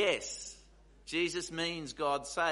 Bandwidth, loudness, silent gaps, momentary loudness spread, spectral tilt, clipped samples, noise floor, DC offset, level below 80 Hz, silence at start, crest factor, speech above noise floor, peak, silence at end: 11.5 kHz; -35 LUFS; none; 14 LU; -2.5 dB/octave; under 0.1%; -60 dBFS; under 0.1%; -62 dBFS; 0 s; 18 dB; 26 dB; -16 dBFS; 0 s